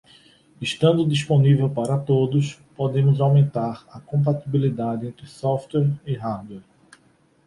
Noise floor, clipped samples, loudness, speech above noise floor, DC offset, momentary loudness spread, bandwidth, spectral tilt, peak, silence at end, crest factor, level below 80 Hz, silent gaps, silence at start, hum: -59 dBFS; under 0.1%; -22 LUFS; 39 dB; under 0.1%; 13 LU; 11.5 kHz; -7.5 dB/octave; -6 dBFS; 0.85 s; 16 dB; -58 dBFS; none; 0.6 s; none